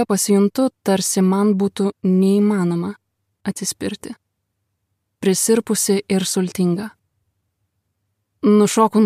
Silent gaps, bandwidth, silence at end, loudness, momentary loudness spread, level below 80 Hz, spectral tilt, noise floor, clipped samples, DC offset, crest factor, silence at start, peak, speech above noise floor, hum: none; 15.5 kHz; 0 s; -18 LUFS; 12 LU; -64 dBFS; -5 dB/octave; -74 dBFS; under 0.1%; under 0.1%; 16 dB; 0 s; -2 dBFS; 57 dB; none